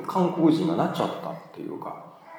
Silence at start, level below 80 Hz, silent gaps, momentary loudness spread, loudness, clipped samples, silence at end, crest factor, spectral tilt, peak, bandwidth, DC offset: 0 s; -78 dBFS; none; 16 LU; -25 LUFS; under 0.1%; 0 s; 16 dB; -7.5 dB/octave; -10 dBFS; 17.5 kHz; under 0.1%